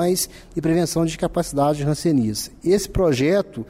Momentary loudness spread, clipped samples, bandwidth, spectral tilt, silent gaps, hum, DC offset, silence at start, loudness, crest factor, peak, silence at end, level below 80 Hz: 6 LU; under 0.1%; 16 kHz; -5.5 dB/octave; none; none; under 0.1%; 0 s; -21 LUFS; 12 dB; -8 dBFS; 0.05 s; -40 dBFS